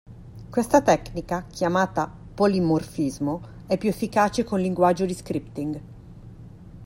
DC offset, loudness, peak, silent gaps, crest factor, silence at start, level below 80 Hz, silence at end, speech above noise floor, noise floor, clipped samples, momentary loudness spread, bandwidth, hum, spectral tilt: under 0.1%; -24 LUFS; -4 dBFS; none; 20 dB; 0.1 s; -48 dBFS; 0 s; 20 dB; -43 dBFS; under 0.1%; 16 LU; 16 kHz; none; -6 dB/octave